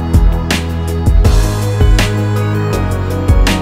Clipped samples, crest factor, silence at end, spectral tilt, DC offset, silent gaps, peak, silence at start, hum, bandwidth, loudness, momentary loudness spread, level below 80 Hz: under 0.1%; 10 dB; 0 s; -6 dB/octave; under 0.1%; none; 0 dBFS; 0 s; none; 16 kHz; -14 LUFS; 5 LU; -14 dBFS